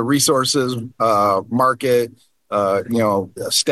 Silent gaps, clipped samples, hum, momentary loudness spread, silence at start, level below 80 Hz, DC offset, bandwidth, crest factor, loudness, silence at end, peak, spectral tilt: none; under 0.1%; none; 7 LU; 0 s; -62 dBFS; 0.1%; 13 kHz; 16 dB; -18 LUFS; 0 s; -2 dBFS; -3.5 dB/octave